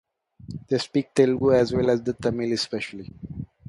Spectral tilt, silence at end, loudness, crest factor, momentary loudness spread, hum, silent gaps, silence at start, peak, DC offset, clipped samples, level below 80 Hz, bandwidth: -6 dB/octave; 0.25 s; -23 LUFS; 18 dB; 18 LU; none; none; 0.45 s; -6 dBFS; under 0.1%; under 0.1%; -52 dBFS; 11.5 kHz